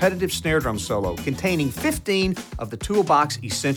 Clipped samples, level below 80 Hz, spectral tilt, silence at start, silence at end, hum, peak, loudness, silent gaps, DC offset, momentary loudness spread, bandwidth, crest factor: under 0.1%; -40 dBFS; -4.5 dB/octave; 0 s; 0 s; none; -4 dBFS; -23 LUFS; none; under 0.1%; 7 LU; over 20 kHz; 18 dB